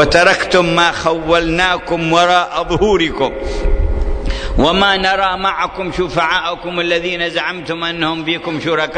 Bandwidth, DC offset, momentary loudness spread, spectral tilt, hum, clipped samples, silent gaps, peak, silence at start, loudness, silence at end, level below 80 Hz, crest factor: 9.6 kHz; under 0.1%; 9 LU; -4.5 dB/octave; none; under 0.1%; none; 0 dBFS; 0 s; -15 LUFS; 0 s; -24 dBFS; 14 dB